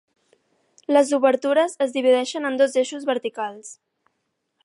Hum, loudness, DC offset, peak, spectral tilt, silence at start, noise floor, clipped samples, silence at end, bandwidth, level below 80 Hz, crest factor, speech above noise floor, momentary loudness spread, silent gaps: none; -21 LUFS; under 0.1%; -4 dBFS; -2.5 dB/octave; 0.9 s; -75 dBFS; under 0.1%; 0.9 s; 11.5 kHz; -80 dBFS; 18 dB; 55 dB; 13 LU; none